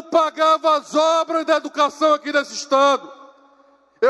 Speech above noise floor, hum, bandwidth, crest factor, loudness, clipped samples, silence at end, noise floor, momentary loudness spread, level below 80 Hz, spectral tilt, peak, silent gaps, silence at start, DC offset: 37 dB; none; 12 kHz; 14 dB; -18 LUFS; under 0.1%; 0 s; -55 dBFS; 5 LU; -76 dBFS; -1.5 dB/octave; -6 dBFS; none; 0.05 s; under 0.1%